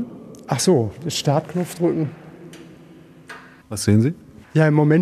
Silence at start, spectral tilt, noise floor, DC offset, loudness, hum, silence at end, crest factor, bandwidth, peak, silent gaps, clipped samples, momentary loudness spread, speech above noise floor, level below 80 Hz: 0 s; -6 dB/octave; -45 dBFS; under 0.1%; -20 LUFS; none; 0 s; 18 dB; 14 kHz; -2 dBFS; none; under 0.1%; 23 LU; 27 dB; -58 dBFS